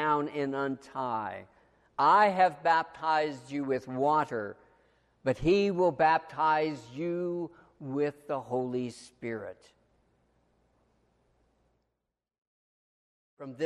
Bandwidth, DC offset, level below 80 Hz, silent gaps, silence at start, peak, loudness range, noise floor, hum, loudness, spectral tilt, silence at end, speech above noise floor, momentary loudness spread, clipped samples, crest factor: 11.5 kHz; under 0.1%; -60 dBFS; 12.38-13.37 s; 0 s; -12 dBFS; 12 LU; -86 dBFS; none; -29 LUFS; -6.5 dB/octave; 0 s; 57 dB; 16 LU; under 0.1%; 20 dB